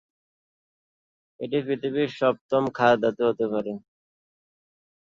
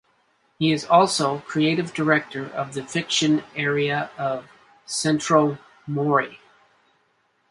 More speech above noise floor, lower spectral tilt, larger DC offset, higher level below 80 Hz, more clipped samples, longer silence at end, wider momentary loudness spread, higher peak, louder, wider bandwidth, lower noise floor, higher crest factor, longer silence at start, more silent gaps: first, over 66 dB vs 45 dB; first, -7 dB/octave vs -4.5 dB/octave; neither; about the same, -68 dBFS vs -66 dBFS; neither; first, 1.35 s vs 1.15 s; about the same, 11 LU vs 12 LU; second, -8 dBFS vs -2 dBFS; second, -25 LUFS vs -22 LUFS; second, 7.6 kHz vs 11.5 kHz; first, under -90 dBFS vs -66 dBFS; about the same, 20 dB vs 20 dB; first, 1.4 s vs 0.6 s; first, 2.41-2.49 s vs none